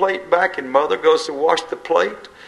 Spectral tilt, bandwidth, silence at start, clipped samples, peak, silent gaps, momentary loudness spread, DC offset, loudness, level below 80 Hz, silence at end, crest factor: -3 dB/octave; 11.5 kHz; 0 s; under 0.1%; 0 dBFS; none; 4 LU; under 0.1%; -18 LUFS; -60 dBFS; 0 s; 18 dB